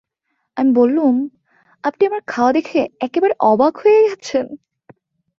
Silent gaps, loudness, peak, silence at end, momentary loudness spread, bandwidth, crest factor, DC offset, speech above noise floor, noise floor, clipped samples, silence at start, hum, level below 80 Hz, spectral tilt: none; -16 LUFS; -2 dBFS; 0.85 s; 12 LU; 7.4 kHz; 16 dB; under 0.1%; 57 dB; -72 dBFS; under 0.1%; 0.55 s; none; -62 dBFS; -5.5 dB/octave